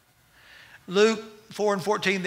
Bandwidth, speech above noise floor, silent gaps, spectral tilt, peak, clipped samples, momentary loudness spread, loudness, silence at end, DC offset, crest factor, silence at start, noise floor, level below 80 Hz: 16 kHz; 34 dB; none; -4 dB/octave; -6 dBFS; under 0.1%; 16 LU; -25 LUFS; 0 s; under 0.1%; 20 dB; 0.9 s; -57 dBFS; -70 dBFS